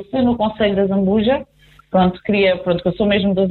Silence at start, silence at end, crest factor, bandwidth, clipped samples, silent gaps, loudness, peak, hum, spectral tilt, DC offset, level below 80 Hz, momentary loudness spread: 0 s; 0 s; 12 dB; 4.4 kHz; under 0.1%; none; -17 LUFS; -4 dBFS; none; -9.5 dB/octave; under 0.1%; -42 dBFS; 3 LU